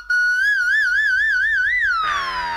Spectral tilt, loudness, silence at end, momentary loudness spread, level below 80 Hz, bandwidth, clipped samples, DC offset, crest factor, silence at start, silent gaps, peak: 0 dB/octave; -17 LUFS; 0 s; 4 LU; -48 dBFS; 13 kHz; under 0.1%; under 0.1%; 10 dB; 0 s; none; -10 dBFS